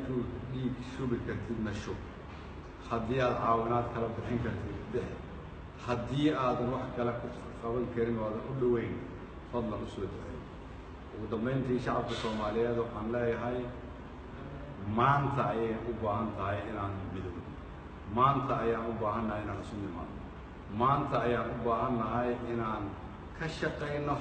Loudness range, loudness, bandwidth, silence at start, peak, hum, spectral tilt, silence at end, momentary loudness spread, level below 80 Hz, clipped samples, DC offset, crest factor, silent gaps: 3 LU; -34 LUFS; 8.8 kHz; 0 s; -14 dBFS; none; -7.5 dB/octave; 0 s; 16 LU; -50 dBFS; under 0.1%; under 0.1%; 20 dB; none